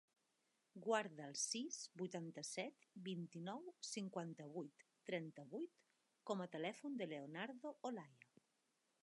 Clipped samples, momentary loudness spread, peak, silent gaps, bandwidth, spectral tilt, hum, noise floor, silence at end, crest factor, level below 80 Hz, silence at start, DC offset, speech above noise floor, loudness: under 0.1%; 11 LU; -26 dBFS; none; 11.5 kHz; -3.5 dB/octave; none; -86 dBFS; 0.9 s; 24 dB; under -90 dBFS; 0.75 s; under 0.1%; 37 dB; -49 LUFS